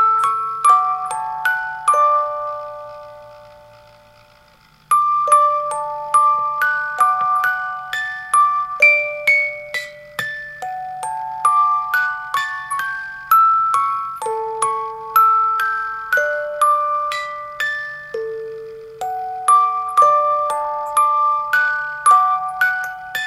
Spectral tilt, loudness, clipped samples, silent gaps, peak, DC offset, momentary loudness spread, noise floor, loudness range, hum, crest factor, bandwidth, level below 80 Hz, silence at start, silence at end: 0 dB/octave; -17 LUFS; under 0.1%; none; -2 dBFS; under 0.1%; 13 LU; -51 dBFS; 5 LU; none; 16 dB; 15 kHz; -60 dBFS; 0 s; 0 s